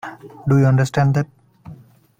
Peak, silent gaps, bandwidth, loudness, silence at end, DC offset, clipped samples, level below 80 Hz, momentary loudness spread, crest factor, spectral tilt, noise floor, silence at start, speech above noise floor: -4 dBFS; none; 9 kHz; -17 LUFS; 0.45 s; under 0.1%; under 0.1%; -50 dBFS; 15 LU; 16 dB; -8 dB/octave; -43 dBFS; 0.05 s; 27 dB